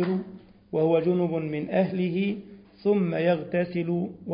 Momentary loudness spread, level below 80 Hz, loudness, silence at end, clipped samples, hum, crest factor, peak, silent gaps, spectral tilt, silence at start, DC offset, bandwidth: 8 LU; -64 dBFS; -26 LUFS; 0 s; under 0.1%; none; 16 dB; -10 dBFS; none; -12 dB/octave; 0 s; under 0.1%; 5.2 kHz